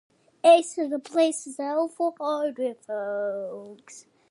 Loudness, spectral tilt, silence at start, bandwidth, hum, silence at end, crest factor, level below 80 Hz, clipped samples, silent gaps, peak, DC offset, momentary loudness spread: -25 LUFS; -3 dB/octave; 0.45 s; 11.5 kHz; none; 0.3 s; 20 dB; -86 dBFS; under 0.1%; none; -6 dBFS; under 0.1%; 17 LU